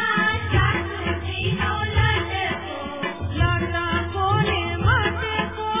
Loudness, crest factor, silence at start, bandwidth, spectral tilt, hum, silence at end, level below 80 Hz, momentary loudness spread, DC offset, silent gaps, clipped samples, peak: -22 LUFS; 16 dB; 0 s; 3.8 kHz; -9.5 dB/octave; none; 0 s; -32 dBFS; 7 LU; 0.3%; none; under 0.1%; -8 dBFS